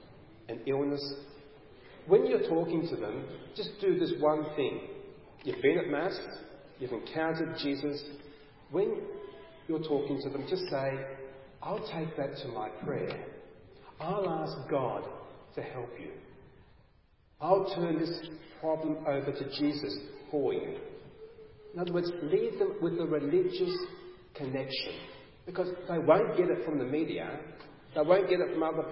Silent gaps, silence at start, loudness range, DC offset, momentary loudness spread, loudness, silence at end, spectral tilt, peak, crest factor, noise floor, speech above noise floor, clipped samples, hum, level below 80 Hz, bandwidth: none; 0 s; 6 LU; under 0.1%; 19 LU; -32 LUFS; 0 s; -5 dB/octave; -10 dBFS; 22 dB; -64 dBFS; 33 dB; under 0.1%; none; -66 dBFS; 5.6 kHz